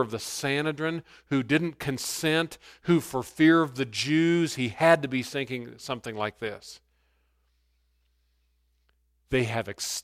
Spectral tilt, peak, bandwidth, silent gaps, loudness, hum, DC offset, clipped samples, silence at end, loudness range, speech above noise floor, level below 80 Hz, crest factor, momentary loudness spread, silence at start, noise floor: -4.5 dB/octave; -6 dBFS; 15.5 kHz; none; -27 LUFS; 60 Hz at -60 dBFS; under 0.1%; under 0.1%; 0 s; 14 LU; 43 dB; -60 dBFS; 22 dB; 14 LU; 0 s; -70 dBFS